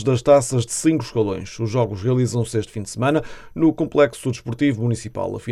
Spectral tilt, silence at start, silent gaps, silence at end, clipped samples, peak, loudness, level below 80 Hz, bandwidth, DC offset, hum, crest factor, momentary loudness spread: -6 dB/octave; 0 s; none; 0 s; under 0.1%; -2 dBFS; -21 LUFS; -48 dBFS; 13.5 kHz; under 0.1%; none; 18 dB; 11 LU